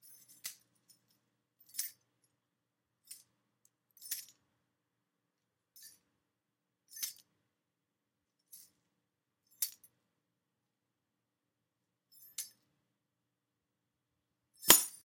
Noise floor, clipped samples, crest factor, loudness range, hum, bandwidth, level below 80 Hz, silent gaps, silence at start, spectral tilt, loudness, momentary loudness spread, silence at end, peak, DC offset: -87 dBFS; under 0.1%; 40 dB; 8 LU; none; 16.5 kHz; -76 dBFS; none; 0.45 s; 0.5 dB/octave; -33 LUFS; 32 LU; 0.15 s; -2 dBFS; under 0.1%